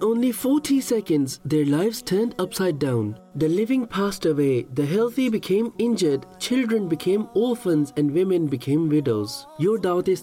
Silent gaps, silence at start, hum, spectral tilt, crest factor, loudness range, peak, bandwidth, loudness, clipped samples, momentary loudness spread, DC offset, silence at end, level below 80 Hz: none; 0 s; none; -6 dB/octave; 10 dB; 1 LU; -12 dBFS; 17 kHz; -23 LUFS; under 0.1%; 4 LU; under 0.1%; 0 s; -58 dBFS